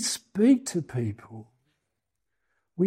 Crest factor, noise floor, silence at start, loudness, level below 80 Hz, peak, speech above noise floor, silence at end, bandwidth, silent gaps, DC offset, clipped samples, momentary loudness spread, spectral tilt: 18 dB; -83 dBFS; 0 s; -26 LUFS; -70 dBFS; -10 dBFS; 57 dB; 0 s; 16 kHz; none; under 0.1%; under 0.1%; 23 LU; -5 dB/octave